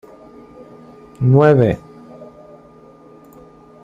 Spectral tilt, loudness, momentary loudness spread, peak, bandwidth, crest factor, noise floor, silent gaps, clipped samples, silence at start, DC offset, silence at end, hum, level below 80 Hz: -10 dB/octave; -14 LUFS; 28 LU; -2 dBFS; 5.2 kHz; 18 dB; -44 dBFS; none; under 0.1%; 1.2 s; under 0.1%; 1.6 s; none; -50 dBFS